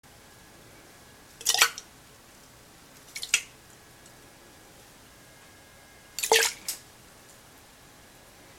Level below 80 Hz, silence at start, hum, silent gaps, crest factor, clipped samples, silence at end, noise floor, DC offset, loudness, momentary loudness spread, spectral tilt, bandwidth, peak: -64 dBFS; 1.4 s; none; none; 32 dB; under 0.1%; 1.8 s; -53 dBFS; under 0.1%; -25 LUFS; 29 LU; 1 dB/octave; 18 kHz; -2 dBFS